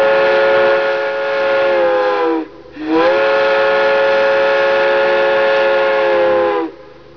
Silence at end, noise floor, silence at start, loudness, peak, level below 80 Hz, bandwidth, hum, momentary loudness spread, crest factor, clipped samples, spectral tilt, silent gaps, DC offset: 0.35 s; -33 dBFS; 0 s; -13 LUFS; -6 dBFS; -54 dBFS; 5.4 kHz; none; 6 LU; 8 dB; under 0.1%; -5 dB/octave; none; 0.4%